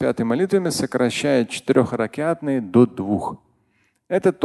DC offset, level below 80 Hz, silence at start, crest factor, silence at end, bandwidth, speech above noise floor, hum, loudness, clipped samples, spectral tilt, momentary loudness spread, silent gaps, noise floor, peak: under 0.1%; -54 dBFS; 0 s; 18 dB; 0 s; 12.5 kHz; 45 dB; none; -20 LUFS; under 0.1%; -6 dB/octave; 7 LU; none; -65 dBFS; -2 dBFS